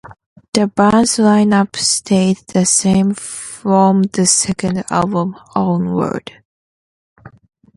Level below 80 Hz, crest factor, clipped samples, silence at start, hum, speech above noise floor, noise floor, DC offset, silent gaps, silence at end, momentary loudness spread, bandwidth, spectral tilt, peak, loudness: -50 dBFS; 16 dB; under 0.1%; 0.05 s; none; over 76 dB; under -90 dBFS; under 0.1%; 0.26-0.36 s, 0.48-0.53 s, 6.45-7.16 s; 0.5 s; 9 LU; 11.5 kHz; -4.5 dB/octave; 0 dBFS; -14 LUFS